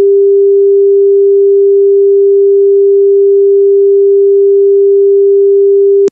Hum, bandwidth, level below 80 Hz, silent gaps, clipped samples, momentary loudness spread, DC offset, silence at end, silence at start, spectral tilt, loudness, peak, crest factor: none; 0.5 kHz; -82 dBFS; none; under 0.1%; 0 LU; under 0.1%; 0 s; 0 s; -8 dB/octave; -6 LUFS; -2 dBFS; 4 dB